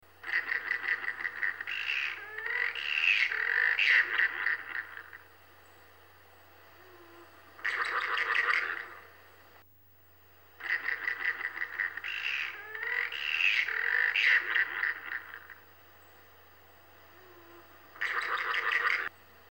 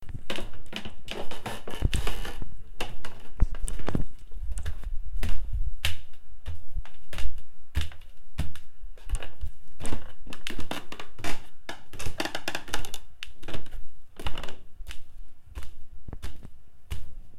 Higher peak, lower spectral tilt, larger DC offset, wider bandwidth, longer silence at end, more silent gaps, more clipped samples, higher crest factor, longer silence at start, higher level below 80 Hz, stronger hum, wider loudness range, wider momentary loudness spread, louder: second, -12 dBFS vs -6 dBFS; second, -0.5 dB/octave vs -4 dB/octave; neither; first, 17.5 kHz vs 14 kHz; first, 0.4 s vs 0 s; neither; neither; first, 22 dB vs 16 dB; first, 0.2 s vs 0 s; second, -80 dBFS vs -34 dBFS; neither; first, 11 LU vs 8 LU; about the same, 14 LU vs 15 LU; first, -29 LUFS vs -37 LUFS